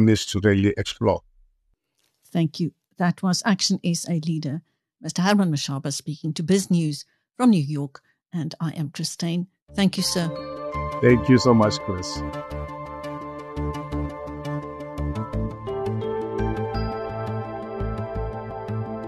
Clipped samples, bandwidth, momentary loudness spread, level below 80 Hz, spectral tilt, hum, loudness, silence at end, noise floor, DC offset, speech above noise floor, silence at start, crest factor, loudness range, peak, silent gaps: under 0.1%; 13 kHz; 13 LU; -42 dBFS; -5.5 dB/octave; none; -24 LUFS; 0 s; -71 dBFS; under 0.1%; 49 dB; 0 s; 22 dB; 8 LU; -4 dBFS; 9.62-9.66 s